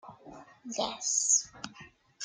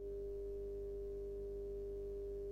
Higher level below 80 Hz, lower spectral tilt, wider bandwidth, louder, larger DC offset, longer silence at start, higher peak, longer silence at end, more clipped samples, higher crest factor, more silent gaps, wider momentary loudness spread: second, -70 dBFS vs -52 dBFS; second, 0 dB/octave vs -9 dB/octave; first, 11 kHz vs 7.2 kHz; first, -28 LUFS vs -46 LUFS; neither; about the same, 0.05 s vs 0 s; first, -14 dBFS vs -38 dBFS; about the same, 0 s vs 0 s; neither; first, 20 dB vs 8 dB; neither; first, 23 LU vs 0 LU